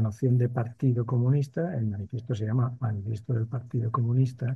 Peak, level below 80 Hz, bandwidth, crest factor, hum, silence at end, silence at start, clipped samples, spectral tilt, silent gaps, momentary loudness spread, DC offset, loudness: -12 dBFS; -56 dBFS; 6.4 kHz; 14 dB; none; 0 s; 0 s; under 0.1%; -9.5 dB/octave; none; 7 LU; under 0.1%; -28 LUFS